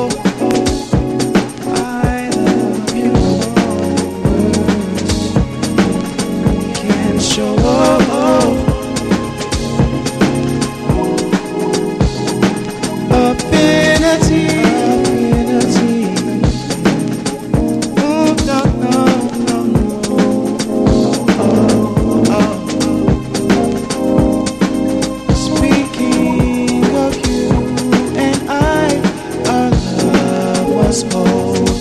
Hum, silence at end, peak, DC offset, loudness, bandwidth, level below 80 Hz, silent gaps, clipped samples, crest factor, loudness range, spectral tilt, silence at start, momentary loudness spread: none; 0 s; 0 dBFS; under 0.1%; -14 LUFS; 13.5 kHz; -28 dBFS; none; under 0.1%; 14 dB; 3 LU; -5.5 dB/octave; 0 s; 5 LU